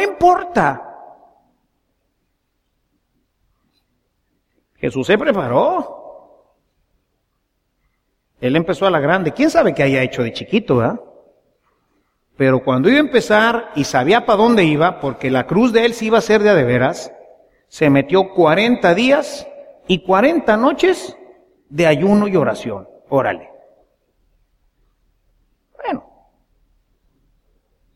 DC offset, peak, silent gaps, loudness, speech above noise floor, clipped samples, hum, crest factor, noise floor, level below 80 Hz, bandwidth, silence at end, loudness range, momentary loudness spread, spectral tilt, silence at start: under 0.1%; 0 dBFS; none; -15 LUFS; 54 dB; under 0.1%; none; 18 dB; -69 dBFS; -50 dBFS; 14.5 kHz; 1.95 s; 12 LU; 15 LU; -6 dB/octave; 0 s